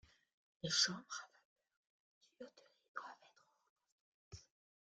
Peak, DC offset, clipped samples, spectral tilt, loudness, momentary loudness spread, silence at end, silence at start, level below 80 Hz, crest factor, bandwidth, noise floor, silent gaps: -20 dBFS; under 0.1%; under 0.1%; -1.5 dB/octave; -40 LUFS; 25 LU; 0.5 s; 0.65 s; -80 dBFS; 28 dB; 9 kHz; -72 dBFS; 1.45-1.56 s, 1.77-1.84 s, 1.90-2.21 s, 2.88-2.95 s, 3.69-3.76 s, 3.92-4.31 s